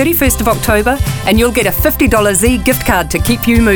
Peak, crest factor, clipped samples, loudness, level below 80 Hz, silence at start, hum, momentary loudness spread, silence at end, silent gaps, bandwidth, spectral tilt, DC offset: 0 dBFS; 10 dB; under 0.1%; -11 LUFS; -22 dBFS; 0 s; none; 3 LU; 0 s; none; over 20 kHz; -4.5 dB/octave; under 0.1%